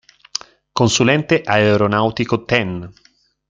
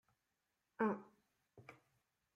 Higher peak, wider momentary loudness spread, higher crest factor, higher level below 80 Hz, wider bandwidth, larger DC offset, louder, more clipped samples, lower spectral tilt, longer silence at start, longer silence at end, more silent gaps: first, -2 dBFS vs -26 dBFS; second, 14 LU vs 22 LU; second, 16 dB vs 24 dB; first, -50 dBFS vs -90 dBFS; first, 9.6 kHz vs 6.8 kHz; neither; first, -16 LUFS vs -42 LUFS; neither; second, -4.5 dB/octave vs -8.5 dB/octave; about the same, 0.75 s vs 0.8 s; about the same, 0.6 s vs 0.6 s; neither